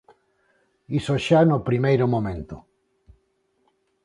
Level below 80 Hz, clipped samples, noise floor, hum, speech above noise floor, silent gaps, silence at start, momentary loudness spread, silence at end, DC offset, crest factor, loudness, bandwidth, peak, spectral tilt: -50 dBFS; under 0.1%; -69 dBFS; none; 48 dB; none; 0.9 s; 18 LU; 1.45 s; under 0.1%; 18 dB; -21 LUFS; 11 kHz; -6 dBFS; -7.5 dB/octave